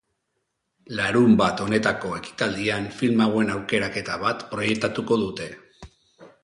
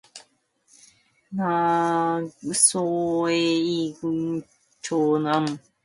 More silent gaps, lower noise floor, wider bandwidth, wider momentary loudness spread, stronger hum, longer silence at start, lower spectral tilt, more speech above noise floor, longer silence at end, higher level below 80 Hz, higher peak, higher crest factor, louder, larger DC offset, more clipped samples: neither; first, -76 dBFS vs -65 dBFS; about the same, 11 kHz vs 11.5 kHz; about the same, 11 LU vs 11 LU; neither; first, 0.9 s vs 0.15 s; first, -5.5 dB/octave vs -4 dB/octave; first, 54 dB vs 41 dB; about the same, 0.15 s vs 0.25 s; first, -54 dBFS vs -68 dBFS; about the same, -6 dBFS vs -6 dBFS; about the same, 18 dB vs 20 dB; about the same, -23 LUFS vs -23 LUFS; neither; neither